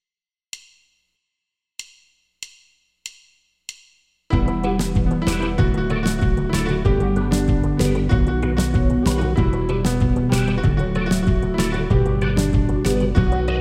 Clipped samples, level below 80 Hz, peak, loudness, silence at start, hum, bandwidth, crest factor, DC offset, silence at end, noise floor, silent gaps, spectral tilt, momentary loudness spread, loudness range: under 0.1%; -24 dBFS; -4 dBFS; -20 LUFS; 0.55 s; none; 15.5 kHz; 16 dB; under 0.1%; 0 s; under -90 dBFS; none; -6.5 dB/octave; 19 LU; 21 LU